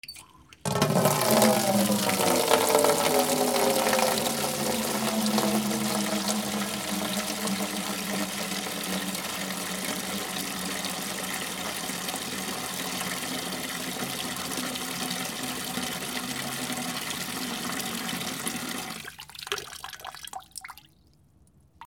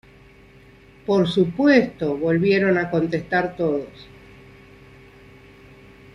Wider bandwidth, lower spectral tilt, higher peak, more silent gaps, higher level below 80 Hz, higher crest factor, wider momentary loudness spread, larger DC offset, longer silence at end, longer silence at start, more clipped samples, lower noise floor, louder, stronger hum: first, over 20 kHz vs 10.5 kHz; second, -3 dB/octave vs -7.5 dB/octave; about the same, -4 dBFS vs -2 dBFS; neither; second, -62 dBFS vs -54 dBFS; first, 26 dB vs 20 dB; first, 11 LU vs 8 LU; neither; second, 0 s vs 2.1 s; second, 0.05 s vs 1.1 s; neither; first, -60 dBFS vs -49 dBFS; second, -27 LUFS vs -20 LUFS; neither